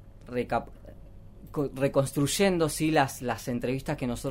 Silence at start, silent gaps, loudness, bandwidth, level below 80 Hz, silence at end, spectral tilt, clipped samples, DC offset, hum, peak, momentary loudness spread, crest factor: 0 s; none; -28 LUFS; 16 kHz; -48 dBFS; 0 s; -5 dB/octave; under 0.1%; under 0.1%; none; -10 dBFS; 9 LU; 20 dB